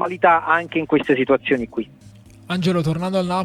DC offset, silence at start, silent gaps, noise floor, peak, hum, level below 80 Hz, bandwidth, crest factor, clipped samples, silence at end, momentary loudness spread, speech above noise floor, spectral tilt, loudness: under 0.1%; 0 s; none; -44 dBFS; 0 dBFS; none; -52 dBFS; 13 kHz; 20 dB; under 0.1%; 0 s; 11 LU; 26 dB; -6.5 dB/octave; -19 LUFS